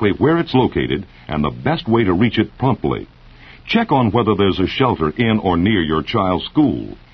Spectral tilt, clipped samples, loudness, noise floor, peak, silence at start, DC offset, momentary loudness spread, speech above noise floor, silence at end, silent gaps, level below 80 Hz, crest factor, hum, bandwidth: -8.5 dB/octave; under 0.1%; -17 LUFS; -42 dBFS; 0 dBFS; 0 s; under 0.1%; 7 LU; 25 dB; 0.2 s; none; -40 dBFS; 16 dB; none; 6.2 kHz